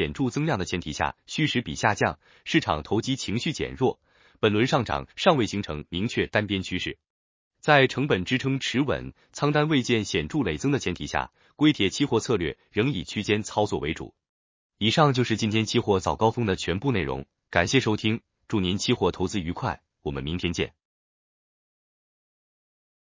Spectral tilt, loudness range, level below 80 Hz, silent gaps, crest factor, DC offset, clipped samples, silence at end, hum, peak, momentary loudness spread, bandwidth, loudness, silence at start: -5 dB/octave; 4 LU; -46 dBFS; 7.10-7.51 s, 14.29-14.70 s; 24 dB; under 0.1%; under 0.1%; 2.35 s; none; -2 dBFS; 9 LU; 7.6 kHz; -25 LUFS; 0 s